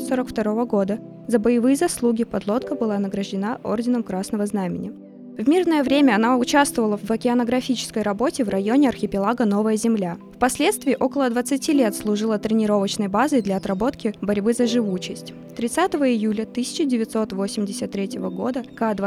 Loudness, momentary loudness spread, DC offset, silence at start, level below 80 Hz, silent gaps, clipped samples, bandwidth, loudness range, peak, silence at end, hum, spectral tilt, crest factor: -22 LUFS; 8 LU; under 0.1%; 0 s; -54 dBFS; none; under 0.1%; 15.5 kHz; 4 LU; -2 dBFS; 0 s; none; -5 dB/octave; 18 dB